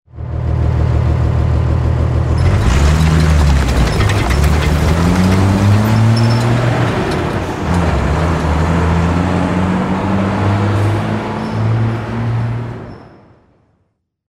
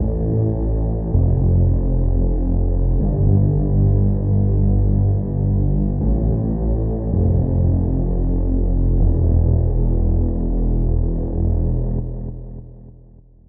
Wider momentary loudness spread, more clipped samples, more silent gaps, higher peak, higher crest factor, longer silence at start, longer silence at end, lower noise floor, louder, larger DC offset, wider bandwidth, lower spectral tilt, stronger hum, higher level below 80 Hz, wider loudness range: about the same, 7 LU vs 5 LU; neither; neither; first, 0 dBFS vs -4 dBFS; about the same, 12 dB vs 12 dB; first, 0.15 s vs 0 s; first, 1.2 s vs 0.6 s; first, -64 dBFS vs -45 dBFS; first, -14 LUFS vs -19 LUFS; neither; first, 15.5 kHz vs 1.7 kHz; second, -7 dB/octave vs -16.5 dB/octave; neither; about the same, -20 dBFS vs -20 dBFS; about the same, 4 LU vs 3 LU